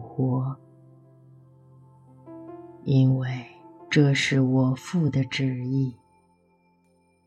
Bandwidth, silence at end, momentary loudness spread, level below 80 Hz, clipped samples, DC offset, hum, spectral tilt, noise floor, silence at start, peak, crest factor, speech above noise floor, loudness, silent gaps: 9.8 kHz; 1.3 s; 22 LU; -64 dBFS; under 0.1%; under 0.1%; none; -6.5 dB/octave; -64 dBFS; 0 s; -6 dBFS; 20 dB; 41 dB; -24 LUFS; none